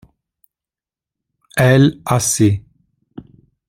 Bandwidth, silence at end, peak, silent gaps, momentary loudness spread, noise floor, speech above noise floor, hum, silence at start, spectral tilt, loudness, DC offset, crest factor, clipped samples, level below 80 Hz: 16 kHz; 0.45 s; -2 dBFS; none; 11 LU; -90 dBFS; 76 dB; none; 1.55 s; -5 dB/octave; -15 LUFS; under 0.1%; 16 dB; under 0.1%; -50 dBFS